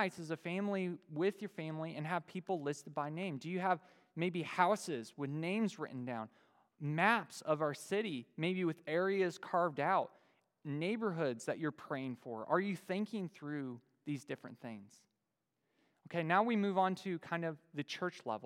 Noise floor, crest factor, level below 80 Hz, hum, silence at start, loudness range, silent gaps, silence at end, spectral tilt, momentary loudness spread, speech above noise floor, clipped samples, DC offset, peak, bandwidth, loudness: -87 dBFS; 24 dB; under -90 dBFS; none; 0 s; 5 LU; none; 0 s; -6 dB/octave; 12 LU; 49 dB; under 0.1%; under 0.1%; -14 dBFS; 16 kHz; -38 LUFS